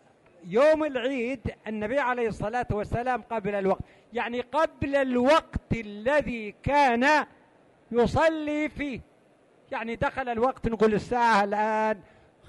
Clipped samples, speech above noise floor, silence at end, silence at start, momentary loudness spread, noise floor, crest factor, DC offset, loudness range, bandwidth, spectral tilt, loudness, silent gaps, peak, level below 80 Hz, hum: under 0.1%; 34 dB; 0.45 s; 0.45 s; 11 LU; -60 dBFS; 14 dB; under 0.1%; 4 LU; 11.5 kHz; -6 dB/octave; -26 LUFS; none; -12 dBFS; -48 dBFS; none